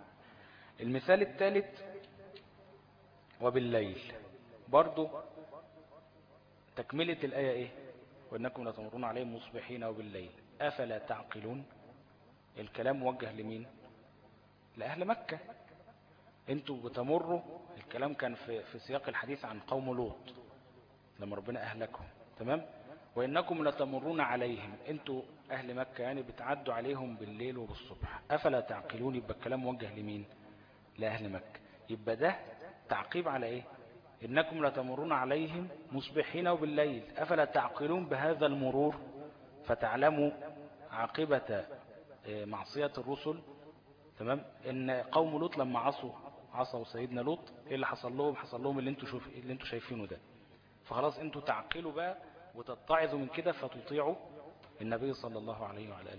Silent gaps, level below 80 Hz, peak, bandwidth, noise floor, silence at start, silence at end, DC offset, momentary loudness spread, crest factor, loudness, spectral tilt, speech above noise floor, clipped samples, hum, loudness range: none; -66 dBFS; -12 dBFS; 5.2 kHz; -63 dBFS; 0 s; 0 s; under 0.1%; 19 LU; 26 dB; -37 LUFS; -4 dB/octave; 27 dB; under 0.1%; none; 7 LU